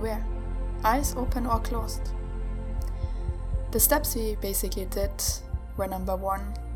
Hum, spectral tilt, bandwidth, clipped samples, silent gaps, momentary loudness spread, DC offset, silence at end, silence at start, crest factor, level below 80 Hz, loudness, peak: none; -4 dB/octave; 19 kHz; under 0.1%; none; 11 LU; under 0.1%; 0 s; 0 s; 22 dB; -32 dBFS; -29 LUFS; -6 dBFS